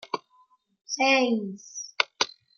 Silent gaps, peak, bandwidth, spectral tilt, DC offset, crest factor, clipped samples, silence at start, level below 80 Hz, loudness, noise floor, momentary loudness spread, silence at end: none; -2 dBFS; 7.2 kHz; -2.5 dB/octave; under 0.1%; 26 dB; under 0.1%; 0.05 s; -80 dBFS; -26 LUFS; -63 dBFS; 16 LU; 0.3 s